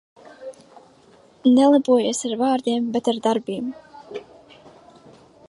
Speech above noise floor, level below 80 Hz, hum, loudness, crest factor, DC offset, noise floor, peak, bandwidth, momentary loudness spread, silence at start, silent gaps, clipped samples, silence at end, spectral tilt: 34 dB; -70 dBFS; none; -20 LUFS; 18 dB; under 0.1%; -52 dBFS; -6 dBFS; 11.5 kHz; 24 LU; 0.4 s; none; under 0.1%; 1.25 s; -4.5 dB/octave